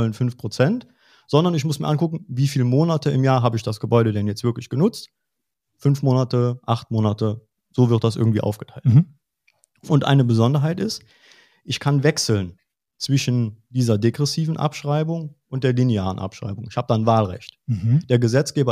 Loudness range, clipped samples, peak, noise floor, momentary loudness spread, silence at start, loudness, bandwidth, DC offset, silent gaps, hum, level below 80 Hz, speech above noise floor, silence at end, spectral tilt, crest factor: 3 LU; under 0.1%; -2 dBFS; -81 dBFS; 10 LU; 0 s; -21 LUFS; 14.5 kHz; under 0.1%; none; none; -58 dBFS; 61 dB; 0 s; -6.5 dB/octave; 18 dB